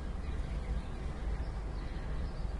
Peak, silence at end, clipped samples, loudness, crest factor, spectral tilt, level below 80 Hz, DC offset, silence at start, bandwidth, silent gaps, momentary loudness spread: -24 dBFS; 0 s; under 0.1%; -41 LUFS; 12 dB; -7 dB/octave; -38 dBFS; under 0.1%; 0 s; 11 kHz; none; 2 LU